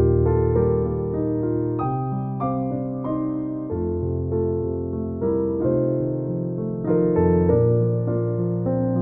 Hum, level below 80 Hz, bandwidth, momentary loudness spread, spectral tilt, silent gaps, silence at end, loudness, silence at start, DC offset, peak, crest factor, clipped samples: none; -38 dBFS; 2.7 kHz; 8 LU; -15 dB/octave; none; 0 s; -23 LUFS; 0 s; under 0.1%; -6 dBFS; 16 dB; under 0.1%